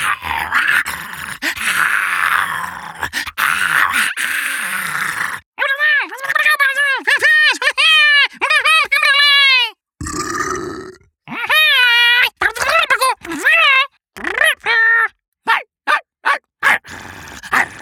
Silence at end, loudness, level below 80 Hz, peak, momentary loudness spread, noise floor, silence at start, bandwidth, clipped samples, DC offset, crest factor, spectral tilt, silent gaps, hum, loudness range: 0 s; -13 LUFS; -48 dBFS; 0 dBFS; 14 LU; -37 dBFS; 0 s; over 20 kHz; under 0.1%; under 0.1%; 14 dB; -0.5 dB/octave; 5.46-5.52 s, 15.28-15.32 s; none; 6 LU